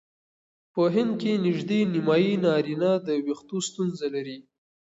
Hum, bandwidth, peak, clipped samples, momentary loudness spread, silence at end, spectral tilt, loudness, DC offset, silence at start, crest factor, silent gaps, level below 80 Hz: none; 8 kHz; -10 dBFS; under 0.1%; 9 LU; 0.45 s; -6 dB/octave; -25 LUFS; under 0.1%; 0.75 s; 16 dB; none; -72 dBFS